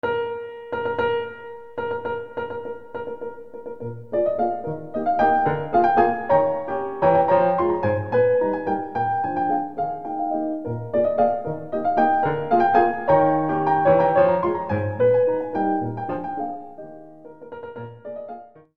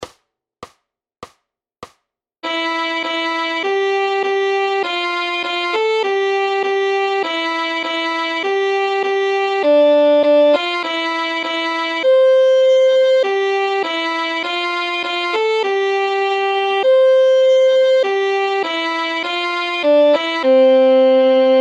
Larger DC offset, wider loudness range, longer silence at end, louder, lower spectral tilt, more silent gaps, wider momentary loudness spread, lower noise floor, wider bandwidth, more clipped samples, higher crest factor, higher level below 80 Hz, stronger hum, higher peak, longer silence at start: first, 0.6% vs under 0.1%; first, 9 LU vs 5 LU; about the same, 0 s vs 0 s; second, -22 LUFS vs -15 LUFS; first, -9 dB/octave vs -2 dB/octave; neither; first, 17 LU vs 7 LU; second, -42 dBFS vs -69 dBFS; second, 5.4 kHz vs 8.4 kHz; neither; first, 18 dB vs 12 dB; first, -58 dBFS vs -72 dBFS; neither; about the same, -4 dBFS vs -4 dBFS; about the same, 0.05 s vs 0 s